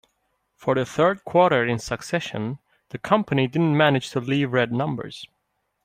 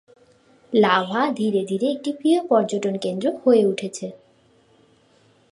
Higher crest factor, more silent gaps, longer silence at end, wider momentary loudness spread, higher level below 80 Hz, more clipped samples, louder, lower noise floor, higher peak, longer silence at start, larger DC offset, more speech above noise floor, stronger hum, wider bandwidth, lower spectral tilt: about the same, 20 dB vs 18 dB; neither; second, 0.6 s vs 1.35 s; first, 14 LU vs 9 LU; first, -58 dBFS vs -72 dBFS; neither; about the same, -22 LUFS vs -21 LUFS; first, -72 dBFS vs -58 dBFS; about the same, -4 dBFS vs -4 dBFS; about the same, 0.6 s vs 0.7 s; neither; first, 50 dB vs 37 dB; neither; first, 15 kHz vs 11.5 kHz; about the same, -6 dB/octave vs -5.5 dB/octave